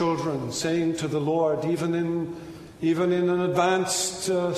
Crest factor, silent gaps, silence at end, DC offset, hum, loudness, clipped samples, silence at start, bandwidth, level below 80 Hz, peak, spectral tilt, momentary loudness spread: 16 dB; none; 0 s; under 0.1%; none; -25 LUFS; under 0.1%; 0 s; 13.5 kHz; -60 dBFS; -8 dBFS; -5 dB/octave; 7 LU